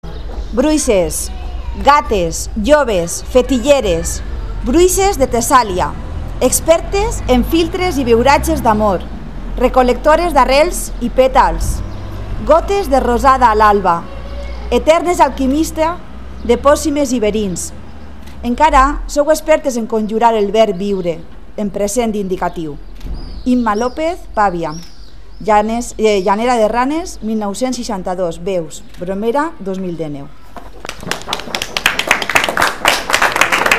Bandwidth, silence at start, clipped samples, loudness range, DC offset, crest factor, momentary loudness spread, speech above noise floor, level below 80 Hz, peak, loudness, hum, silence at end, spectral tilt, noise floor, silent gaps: 16.5 kHz; 0 s; 0.1%; 6 LU; 3%; 14 dB; 15 LU; 23 dB; -26 dBFS; 0 dBFS; -14 LUFS; none; 0 s; -4 dB/octave; -36 dBFS; none